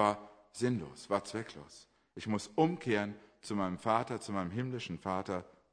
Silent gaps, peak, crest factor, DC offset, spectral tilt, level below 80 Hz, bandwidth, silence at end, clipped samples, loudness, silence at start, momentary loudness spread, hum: none; -14 dBFS; 22 dB; under 0.1%; -6 dB/octave; -70 dBFS; 10.5 kHz; 0.25 s; under 0.1%; -36 LUFS; 0 s; 15 LU; none